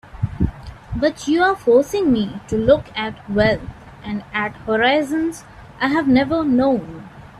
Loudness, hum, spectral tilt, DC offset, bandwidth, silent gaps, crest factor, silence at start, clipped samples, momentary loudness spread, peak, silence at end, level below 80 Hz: -19 LUFS; none; -6 dB/octave; under 0.1%; 13.5 kHz; none; 16 dB; 0.15 s; under 0.1%; 14 LU; -2 dBFS; 0 s; -40 dBFS